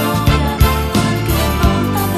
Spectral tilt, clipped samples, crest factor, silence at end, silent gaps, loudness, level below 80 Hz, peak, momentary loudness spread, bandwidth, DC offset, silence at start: -5.5 dB/octave; under 0.1%; 14 dB; 0 s; none; -15 LUFS; -20 dBFS; 0 dBFS; 2 LU; 14.5 kHz; under 0.1%; 0 s